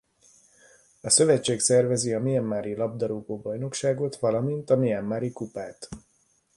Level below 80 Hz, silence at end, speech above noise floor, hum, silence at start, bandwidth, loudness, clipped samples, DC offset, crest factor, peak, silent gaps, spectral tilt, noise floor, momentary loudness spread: -62 dBFS; 0.55 s; 42 dB; none; 1.05 s; 11.5 kHz; -25 LUFS; under 0.1%; under 0.1%; 20 dB; -6 dBFS; none; -4.5 dB/octave; -67 dBFS; 16 LU